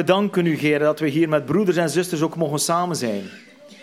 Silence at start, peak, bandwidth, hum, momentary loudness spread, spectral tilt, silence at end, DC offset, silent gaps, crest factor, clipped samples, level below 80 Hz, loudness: 0 s; -4 dBFS; 16 kHz; none; 6 LU; -5 dB/octave; 0.1 s; under 0.1%; none; 18 dB; under 0.1%; -68 dBFS; -21 LUFS